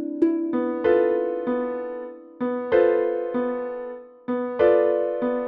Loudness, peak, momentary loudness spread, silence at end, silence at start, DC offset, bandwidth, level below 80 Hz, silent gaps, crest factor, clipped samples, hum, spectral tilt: -23 LUFS; -6 dBFS; 14 LU; 0 s; 0 s; under 0.1%; 4.3 kHz; -60 dBFS; none; 16 dB; under 0.1%; none; -5 dB/octave